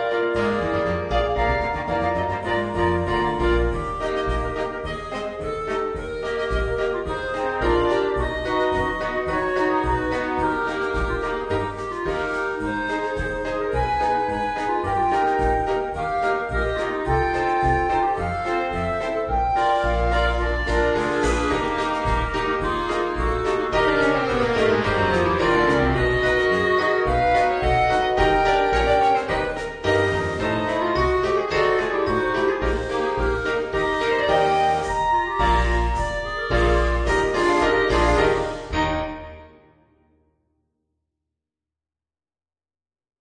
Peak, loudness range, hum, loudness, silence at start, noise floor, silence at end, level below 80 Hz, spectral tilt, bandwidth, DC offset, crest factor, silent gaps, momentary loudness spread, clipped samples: -4 dBFS; 5 LU; none; -22 LUFS; 0 s; under -90 dBFS; 3.7 s; -32 dBFS; -6 dB/octave; 10 kHz; under 0.1%; 18 dB; none; 7 LU; under 0.1%